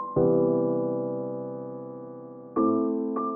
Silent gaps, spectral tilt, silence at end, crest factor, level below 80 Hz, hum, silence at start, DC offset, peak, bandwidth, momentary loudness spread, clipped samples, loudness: none; -14 dB/octave; 0 s; 16 dB; -66 dBFS; none; 0 s; under 0.1%; -12 dBFS; 2.1 kHz; 17 LU; under 0.1%; -27 LUFS